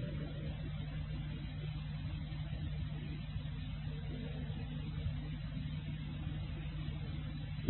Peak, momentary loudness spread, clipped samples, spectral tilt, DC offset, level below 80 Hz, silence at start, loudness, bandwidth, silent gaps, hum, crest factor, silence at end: -16 dBFS; 2 LU; under 0.1%; -6.5 dB/octave; under 0.1%; -46 dBFS; 0 s; -43 LUFS; 4.2 kHz; none; none; 24 dB; 0 s